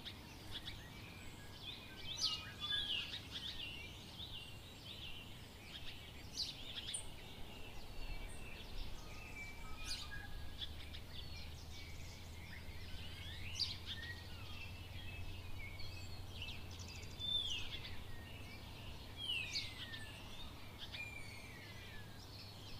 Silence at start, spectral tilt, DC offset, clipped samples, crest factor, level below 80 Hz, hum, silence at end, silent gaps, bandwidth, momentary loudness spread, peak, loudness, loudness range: 0 s; -2.5 dB/octave; under 0.1%; under 0.1%; 20 dB; -56 dBFS; none; 0 s; none; 15.5 kHz; 13 LU; -26 dBFS; -47 LUFS; 7 LU